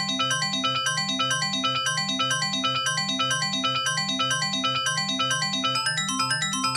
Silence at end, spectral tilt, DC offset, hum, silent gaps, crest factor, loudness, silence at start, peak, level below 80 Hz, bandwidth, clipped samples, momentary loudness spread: 0 s; -1.5 dB/octave; under 0.1%; none; none; 14 dB; -23 LUFS; 0 s; -12 dBFS; -62 dBFS; 16 kHz; under 0.1%; 1 LU